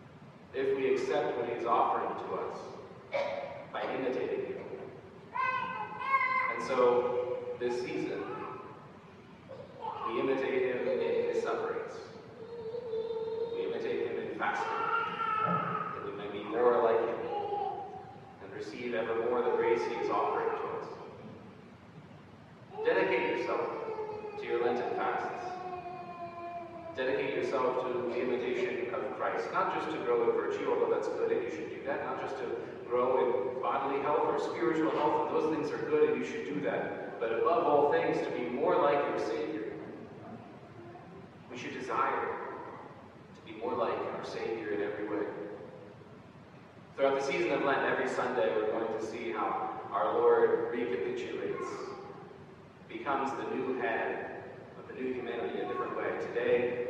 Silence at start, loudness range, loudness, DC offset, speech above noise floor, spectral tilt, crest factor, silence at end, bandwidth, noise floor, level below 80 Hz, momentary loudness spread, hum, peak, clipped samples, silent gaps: 0 s; 6 LU; -33 LUFS; under 0.1%; 21 dB; -6 dB/octave; 20 dB; 0 s; 9 kHz; -53 dBFS; -74 dBFS; 19 LU; none; -14 dBFS; under 0.1%; none